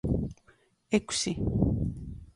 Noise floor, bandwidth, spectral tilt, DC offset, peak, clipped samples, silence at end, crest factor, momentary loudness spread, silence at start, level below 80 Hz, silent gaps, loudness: -64 dBFS; 11.5 kHz; -5 dB/octave; under 0.1%; -12 dBFS; under 0.1%; 0.05 s; 20 dB; 9 LU; 0.05 s; -40 dBFS; none; -30 LUFS